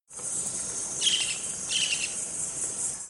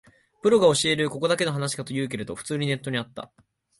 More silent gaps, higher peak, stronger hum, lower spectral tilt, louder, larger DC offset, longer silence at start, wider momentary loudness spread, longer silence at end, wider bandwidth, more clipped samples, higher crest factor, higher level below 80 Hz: neither; second, -12 dBFS vs -6 dBFS; neither; second, 1 dB/octave vs -4.5 dB/octave; second, -27 LUFS vs -24 LUFS; neither; second, 0.1 s vs 0.45 s; second, 6 LU vs 14 LU; second, 0 s vs 0.55 s; first, 16.5 kHz vs 11.5 kHz; neither; about the same, 20 dB vs 18 dB; about the same, -62 dBFS vs -62 dBFS